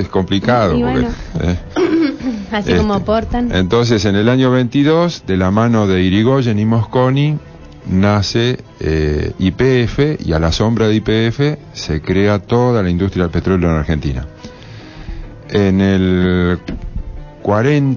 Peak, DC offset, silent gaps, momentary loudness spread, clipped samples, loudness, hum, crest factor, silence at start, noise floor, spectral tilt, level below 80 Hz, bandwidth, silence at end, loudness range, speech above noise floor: -2 dBFS; under 0.1%; none; 12 LU; under 0.1%; -15 LUFS; none; 12 dB; 0 s; -34 dBFS; -7 dB/octave; -28 dBFS; 7.2 kHz; 0 s; 4 LU; 20 dB